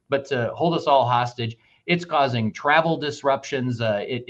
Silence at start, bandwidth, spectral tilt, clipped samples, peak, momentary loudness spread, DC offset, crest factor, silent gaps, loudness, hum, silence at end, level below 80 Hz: 0.1 s; 8.2 kHz; -6 dB/octave; under 0.1%; -4 dBFS; 8 LU; under 0.1%; 18 dB; none; -22 LUFS; none; 0.05 s; -64 dBFS